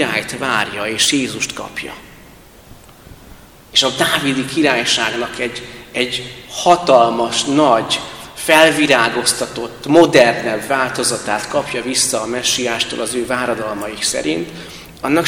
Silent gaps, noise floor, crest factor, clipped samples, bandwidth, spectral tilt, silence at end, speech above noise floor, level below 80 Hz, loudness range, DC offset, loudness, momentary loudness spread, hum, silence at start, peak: none; -42 dBFS; 16 dB; 0.2%; 19.5 kHz; -2.5 dB/octave; 0 s; 26 dB; -48 dBFS; 6 LU; under 0.1%; -15 LUFS; 14 LU; none; 0 s; 0 dBFS